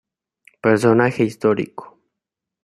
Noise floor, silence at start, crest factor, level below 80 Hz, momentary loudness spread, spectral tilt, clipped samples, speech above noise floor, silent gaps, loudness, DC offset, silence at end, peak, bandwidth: -84 dBFS; 0.65 s; 18 dB; -62 dBFS; 13 LU; -7 dB/octave; under 0.1%; 67 dB; none; -18 LUFS; under 0.1%; 0.8 s; -2 dBFS; 13.5 kHz